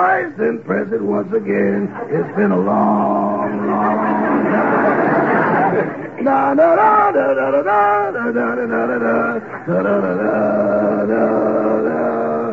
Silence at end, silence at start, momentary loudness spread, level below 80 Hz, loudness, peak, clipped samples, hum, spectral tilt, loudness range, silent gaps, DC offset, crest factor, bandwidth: 0 s; 0 s; 7 LU; -62 dBFS; -16 LUFS; -2 dBFS; under 0.1%; none; -9.5 dB/octave; 3 LU; none; 0.2%; 14 dB; 7 kHz